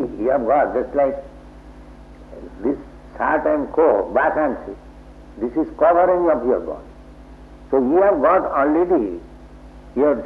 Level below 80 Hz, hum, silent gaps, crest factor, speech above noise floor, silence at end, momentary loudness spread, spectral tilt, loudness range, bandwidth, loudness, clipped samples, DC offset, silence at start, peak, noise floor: -44 dBFS; 50 Hz at -45 dBFS; none; 16 dB; 23 dB; 0 s; 17 LU; -9 dB/octave; 5 LU; 5.6 kHz; -19 LUFS; under 0.1%; under 0.1%; 0 s; -4 dBFS; -41 dBFS